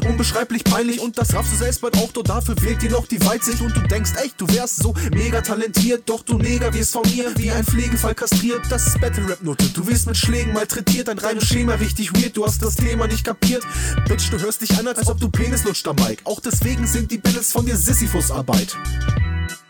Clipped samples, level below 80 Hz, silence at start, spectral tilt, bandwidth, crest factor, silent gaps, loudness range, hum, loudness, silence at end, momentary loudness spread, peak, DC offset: under 0.1%; -26 dBFS; 0 s; -4.5 dB/octave; over 20 kHz; 14 dB; none; 1 LU; none; -19 LUFS; 0.1 s; 4 LU; -4 dBFS; under 0.1%